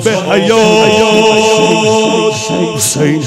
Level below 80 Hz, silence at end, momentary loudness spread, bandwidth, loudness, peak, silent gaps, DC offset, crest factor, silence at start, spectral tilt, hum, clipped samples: -50 dBFS; 0 s; 5 LU; 16 kHz; -9 LUFS; 0 dBFS; none; under 0.1%; 10 dB; 0 s; -4 dB/octave; none; 1%